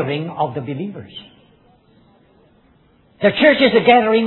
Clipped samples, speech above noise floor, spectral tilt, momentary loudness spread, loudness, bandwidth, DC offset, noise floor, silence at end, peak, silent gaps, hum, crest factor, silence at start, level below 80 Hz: under 0.1%; 38 dB; -8.5 dB/octave; 22 LU; -15 LUFS; 4.3 kHz; under 0.1%; -54 dBFS; 0 s; 0 dBFS; none; none; 18 dB; 0 s; -56 dBFS